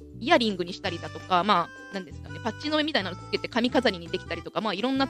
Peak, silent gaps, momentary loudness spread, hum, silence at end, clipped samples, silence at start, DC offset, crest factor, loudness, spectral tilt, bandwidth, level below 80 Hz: -6 dBFS; none; 13 LU; none; 0 s; under 0.1%; 0 s; under 0.1%; 22 dB; -27 LUFS; -5 dB/octave; 13.5 kHz; -54 dBFS